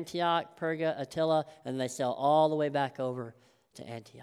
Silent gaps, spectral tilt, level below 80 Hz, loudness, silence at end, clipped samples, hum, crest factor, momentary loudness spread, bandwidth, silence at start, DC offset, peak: none; -5.5 dB/octave; -76 dBFS; -31 LUFS; 0 s; under 0.1%; none; 18 dB; 19 LU; 14 kHz; 0 s; under 0.1%; -14 dBFS